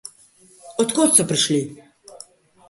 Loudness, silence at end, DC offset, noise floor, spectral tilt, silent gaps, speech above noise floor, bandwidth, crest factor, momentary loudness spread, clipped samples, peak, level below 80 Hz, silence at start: -17 LUFS; 0.95 s; under 0.1%; -52 dBFS; -3 dB/octave; none; 34 dB; 12 kHz; 22 dB; 19 LU; under 0.1%; 0 dBFS; -64 dBFS; 0.05 s